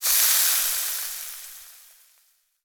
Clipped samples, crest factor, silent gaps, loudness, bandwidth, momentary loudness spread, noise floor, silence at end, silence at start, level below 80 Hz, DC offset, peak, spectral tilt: under 0.1%; 24 dB; none; -20 LUFS; over 20 kHz; 22 LU; -64 dBFS; 0.95 s; 0 s; -64 dBFS; under 0.1%; -2 dBFS; 5.5 dB/octave